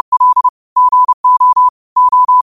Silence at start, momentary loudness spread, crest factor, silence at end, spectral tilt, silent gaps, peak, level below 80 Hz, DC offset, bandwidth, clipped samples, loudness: 0.1 s; 4 LU; 6 dB; 0.1 s; -1.5 dB/octave; 0.49-0.76 s, 1.14-1.24 s, 1.69-1.96 s; -4 dBFS; -62 dBFS; 0.3%; 1.4 kHz; under 0.1%; -10 LUFS